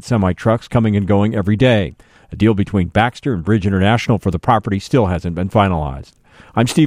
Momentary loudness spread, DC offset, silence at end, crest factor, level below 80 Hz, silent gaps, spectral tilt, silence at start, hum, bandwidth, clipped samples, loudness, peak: 6 LU; under 0.1%; 0 s; 14 dB; -36 dBFS; none; -7 dB/octave; 0.05 s; none; 14.5 kHz; under 0.1%; -16 LUFS; 0 dBFS